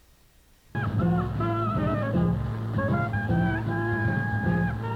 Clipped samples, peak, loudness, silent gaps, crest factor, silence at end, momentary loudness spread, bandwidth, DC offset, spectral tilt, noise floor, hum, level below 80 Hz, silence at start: under 0.1%; -14 dBFS; -27 LUFS; none; 14 dB; 0 s; 4 LU; 5.6 kHz; under 0.1%; -9 dB/octave; -58 dBFS; none; -42 dBFS; 0.75 s